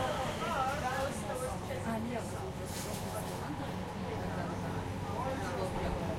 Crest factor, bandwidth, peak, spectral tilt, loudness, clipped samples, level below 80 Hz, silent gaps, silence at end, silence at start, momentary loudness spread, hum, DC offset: 14 dB; 16.5 kHz; -22 dBFS; -5 dB/octave; -37 LUFS; under 0.1%; -50 dBFS; none; 0 s; 0 s; 5 LU; none; under 0.1%